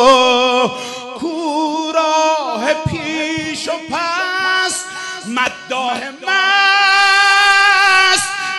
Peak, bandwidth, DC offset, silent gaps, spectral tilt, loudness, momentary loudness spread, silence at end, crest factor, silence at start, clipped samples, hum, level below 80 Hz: 0 dBFS; 12 kHz; under 0.1%; none; -2 dB/octave; -13 LUFS; 12 LU; 0 s; 14 dB; 0 s; under 0.1%; none; -50 dBFS